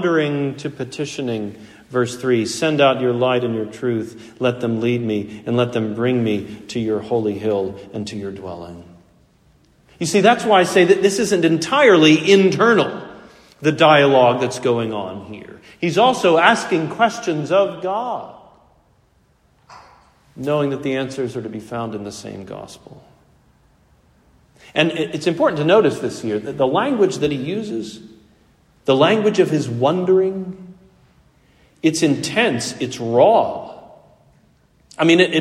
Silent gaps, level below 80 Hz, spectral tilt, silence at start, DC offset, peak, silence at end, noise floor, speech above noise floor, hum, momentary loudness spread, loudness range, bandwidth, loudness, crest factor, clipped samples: none; -58 dBFS; -5 dB/octave; 0 s; under 0.1%; 0 dBFS; 0 s; -58 dBFS; 40 dB; none; 16 LU; 11 LU; 14 kHz; -18 LUFS; 18 dB; under 0.1%